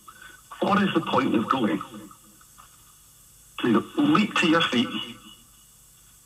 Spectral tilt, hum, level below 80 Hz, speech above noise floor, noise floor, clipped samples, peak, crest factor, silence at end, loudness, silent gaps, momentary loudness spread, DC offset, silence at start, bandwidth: -5 dB/octave; none; -64 dBFS; 31 dB; -54 dBFS; under 0.1%; -8 dBFS; 20 dB; 0.9 s; -23 LUFS; none; 22 LU; under 0.1%; 0.1 s; 15.5 kHz